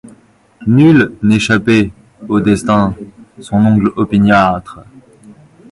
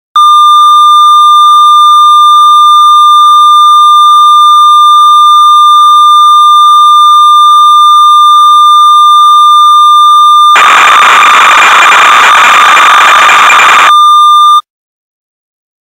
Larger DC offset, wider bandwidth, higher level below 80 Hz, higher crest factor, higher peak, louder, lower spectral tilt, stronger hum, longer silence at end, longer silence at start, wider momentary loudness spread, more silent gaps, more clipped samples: second, under 0.1% vs 0.2%; second, 11.5 kHz vs 16.5 kHz; first, -40 dBFS vs -56 dBFS; first, 12 dB vs 2 dB; about the same, 0 dBFS vs 0 dBFS; second, -12 LUFS vs -1 LUFS; first, -7 dB/octave vs 2 dB/octave; neither; second, 0.4 s vs 1.25 s; first, 0.6 s vs 0.15 s; first, 10 LU vs 0 LU; neither; second, under 0.1% vs 20%